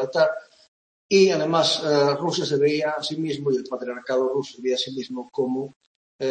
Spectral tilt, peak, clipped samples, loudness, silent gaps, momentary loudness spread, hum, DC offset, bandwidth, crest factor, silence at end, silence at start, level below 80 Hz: -4.5 dB/octave; -6 dBFS; under 0.1%; -23 LUFS; 0.68-1.09 s, 5.76-5.80 s, 5.87-6.19 s; 12 LU; none; under 0.1%; 8.8 kHz; 18 dB; 0 s; 0 s; -70 dBFS